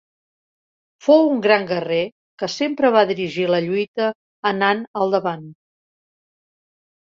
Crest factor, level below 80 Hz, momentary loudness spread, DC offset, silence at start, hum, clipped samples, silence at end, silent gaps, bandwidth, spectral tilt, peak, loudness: 20 dB; -68 dBFS; 11 LU; under 0.1%; 1.05 s; none; under 0.1%; 1.65 s; 2.12-2.38 s, 3.88-3.94 s, 4.15-4.43 s, 4.87-4.94 s; 7.6 kHz; -5.5 dB/octave; -2 dBFS; -19 LUFS